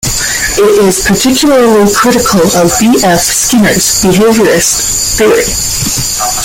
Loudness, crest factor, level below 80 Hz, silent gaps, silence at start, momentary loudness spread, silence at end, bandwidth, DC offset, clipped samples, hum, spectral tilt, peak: -7 LUFS; 8 dB; -28 dBFS; none; 0 s; 4 LU; 0 s; 17 kHz; under 0.1%; under 0.1%; none; -3 dB/octave; 0 dBFS